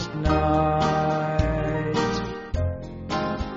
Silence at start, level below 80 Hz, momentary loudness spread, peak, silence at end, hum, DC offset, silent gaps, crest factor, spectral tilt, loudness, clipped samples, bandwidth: 0 s; -34 dBFS; 9 LU; -8 dBFS; 0 s; none; under 0.1%; none; 16 dB; -5.5 dB/octave; -24 LUFS; under 0.1%; 7.6 kHz